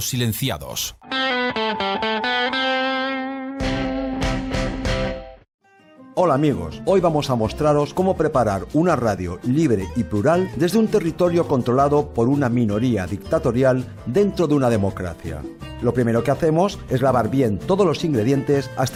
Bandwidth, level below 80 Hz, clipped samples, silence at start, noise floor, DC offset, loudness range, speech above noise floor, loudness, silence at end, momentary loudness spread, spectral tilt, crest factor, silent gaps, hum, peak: 16.5 kHz; -38 dBFS; under 0.1%; 0 s; -48 dBFS; under 0.1%; 4 LU; 28 dB; -20 LUFS; 0 s; 7 LU; -6 dB/octave; 14 dB; 5.54-5.59 s; none; -6 dBFS